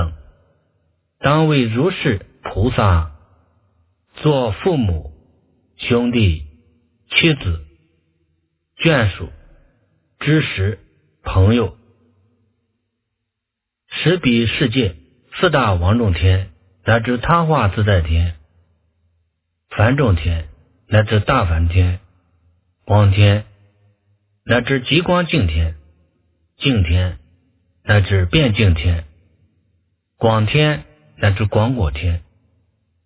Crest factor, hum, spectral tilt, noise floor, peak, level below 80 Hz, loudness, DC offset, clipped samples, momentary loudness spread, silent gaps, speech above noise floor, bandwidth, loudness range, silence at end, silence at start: 18 dB; none; -11 dB/octave; -81 dBFS; 0 dBFS; -28 dBFS; -17 LUFS; under 0.1%; under 0.1%; 11 LU; none; 66 dB; 4 kHz; 4 LU; 0.85 s; 0 s